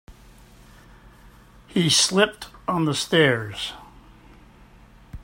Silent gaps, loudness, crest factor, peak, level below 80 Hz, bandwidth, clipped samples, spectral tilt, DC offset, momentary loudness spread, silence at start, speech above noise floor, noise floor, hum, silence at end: none; -21 LUFS; 22 dB; -4 dBFS; -50 dBFS; 16 kHz; under 0.1%; -3.5 dB/octave; under 0.1%; 15 LU; 0.1 s; 29 dB; -50 dBFS; none; 0.05 s